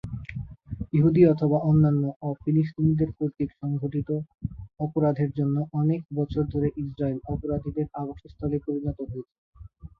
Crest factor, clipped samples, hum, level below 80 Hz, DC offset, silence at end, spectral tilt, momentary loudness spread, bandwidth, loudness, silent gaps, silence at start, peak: 18 dB; under 0.1%; none; -46 dBFS; under 0.1%; 0.1 s; -12 dB/octave; 16 LU; 4.8 kHz; -26 LUFS; 2.16-2.20 s, 9.38-9.53 s; 0.05 s; -8 dBFS